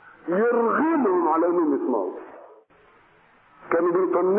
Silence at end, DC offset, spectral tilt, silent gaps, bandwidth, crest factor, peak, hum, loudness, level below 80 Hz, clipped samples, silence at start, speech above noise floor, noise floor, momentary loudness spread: 0 s; under 0.1%; -12 dB/octave; none; 3.2 kHz; 16 dB; -8 dBFS; none; -22 LUFS; -72 dBFS; under 0.1%; 0.25 s; 35 dB; -57 dBFS; 7 LU